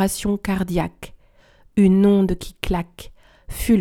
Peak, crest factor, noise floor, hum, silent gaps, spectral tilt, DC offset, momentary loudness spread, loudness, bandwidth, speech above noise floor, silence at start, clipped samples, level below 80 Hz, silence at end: -4 dBFS; 16 dB; -53 dBFS; none; none; -6.5 dB/octave; under 0.1%; 21 LU; -20 LUFS; 17 kHz; 34 dB; 0 s; under 0.1%; -36 dBFS; 0 s